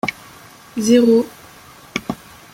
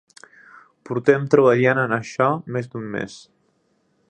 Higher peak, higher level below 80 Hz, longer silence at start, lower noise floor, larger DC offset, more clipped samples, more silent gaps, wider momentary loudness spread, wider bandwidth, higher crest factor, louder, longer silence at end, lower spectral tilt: about the same, -2 dBFS vs -2 dBFS; first, -54 dBFS vs -66 dBFS; second, 0.05 s vs 0.9 s; second, -43 dBFS vs -66 dBFS; neither; neither; neither; first, 18 LU vs 14 LU; first, 16 kHz vs 9.2 kHz; about the same, 18 dB vs 20 dB; first, -17 LUFS vs -20 LUFS; second, 0.4 s vs 0.9 s; second, -4.5 dB/octave vs -7 dB/octave